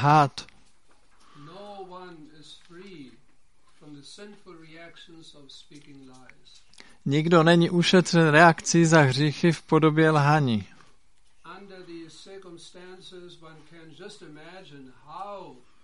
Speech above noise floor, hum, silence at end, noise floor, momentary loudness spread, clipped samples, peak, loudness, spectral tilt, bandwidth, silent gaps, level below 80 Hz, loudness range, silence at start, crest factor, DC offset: 40 dB; none; 0.4 s; -64 dBFS; 27 LU; under 0.1%; -2 dBFS; -20 LUFS; -5.5 dB/octave; 11.5 kHz; none; -64 dBFS; 25 LU; 0 s; 24 dB; 0.3%